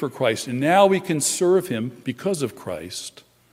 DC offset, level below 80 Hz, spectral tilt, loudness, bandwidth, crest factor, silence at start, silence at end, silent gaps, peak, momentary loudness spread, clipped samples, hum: under 0.1%; -66 dBFS; -4 dB/octave; -21 LUFS; 16 kHz; 20 dB; 0 s; 0.45 s; none; -2 dBFS; 16 LU; under 0.1%; none